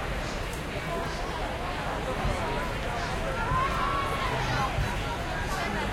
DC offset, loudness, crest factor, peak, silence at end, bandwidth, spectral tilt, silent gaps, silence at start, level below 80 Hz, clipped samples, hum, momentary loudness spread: under 0.1%; -30 LUFS; 14 dB; -14 dBFS; 0 s; 16.5 kHz; -5 dB/octave; none; 0 s; -36 dBFS; under 0.1%; none; 5 LU